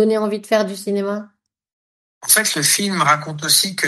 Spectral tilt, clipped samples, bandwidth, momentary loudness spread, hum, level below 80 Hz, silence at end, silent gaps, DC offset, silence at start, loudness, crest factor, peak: -2 dB/octave; under 0.1%; 13 kHz; 9 LU; none; -68 dBFS; 0 s; 1.73-2.21 s; under 0.1%; 0 s; -16 LUFS; 18 dB; 0 dBFS